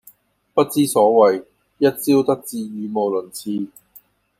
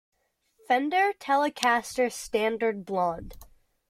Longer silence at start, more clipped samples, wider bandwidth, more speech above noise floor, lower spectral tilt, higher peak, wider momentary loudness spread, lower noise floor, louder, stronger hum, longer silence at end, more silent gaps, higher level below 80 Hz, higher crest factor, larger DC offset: second, 0.55 s vs 0.7 s; neither; about the same, 16 kHz vs 16 kHz; second, 34 dB vs 41 dB; first, -5 dB/octave vs -3.5 dB/octave; first, -2 dBFS vs -6 dBFS; first, 13 LU vs 5 LU; second, -52 dBFS vs -67 dBFS; first, -19 LUFS vs -26 LUFS; neither; first, 0.75 s vs 0.45 s; neither; second, -66 dBFS vs -56 dBFS; about the same, 18 dB vs 22 dB; neither